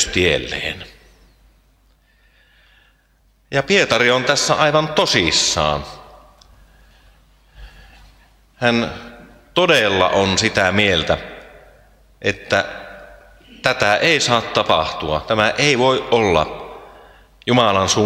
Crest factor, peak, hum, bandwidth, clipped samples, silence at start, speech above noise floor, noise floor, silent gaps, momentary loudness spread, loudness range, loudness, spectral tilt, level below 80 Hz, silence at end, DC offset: 20 dB; 0 dBFS; none; 16 kHz; under 0.1%; 0 s; 41 dB; -57 dBFS; none; 12 LU; 10 LU; -16 LUFS; -3 dB/octave; -44 dBFS; 0 s; under 0.1%